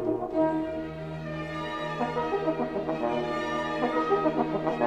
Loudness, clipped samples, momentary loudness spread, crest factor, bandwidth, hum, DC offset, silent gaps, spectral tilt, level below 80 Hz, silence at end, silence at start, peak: -29 LUFS; under 0.1%; 9 LU; 18 dB; 9.2 kHz; none; 0.1%; none; -7 dB/octave; -56 dBFS; 0 s; 0 s; -10 dBFS